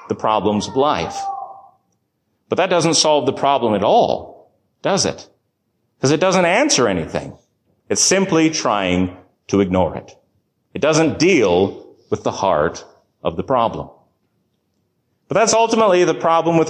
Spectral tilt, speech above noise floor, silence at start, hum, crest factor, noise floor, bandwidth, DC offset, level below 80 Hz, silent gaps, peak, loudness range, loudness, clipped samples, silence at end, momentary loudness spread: -4 dB/octave; 53 dB; 0 s; none; 16 dB; -69 dBFS; 12.5 kHz; under 0.1%; -46 dBFS; none; -4 dBFS; 4 LU; -17 LUFS; under 0.1%; 0 s; 13 LU